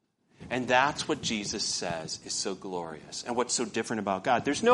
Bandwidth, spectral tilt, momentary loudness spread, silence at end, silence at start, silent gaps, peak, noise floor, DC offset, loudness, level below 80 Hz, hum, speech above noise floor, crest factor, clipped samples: 11.5 kHz; -3 dB/octave; 11 LU; 0 s; 0.4 s; none; -8 dBFS; -51 dBFS; under 0.1%; -30 LUFS; -64 dBFS; none; 22 dB; 20 dB; under 0.1%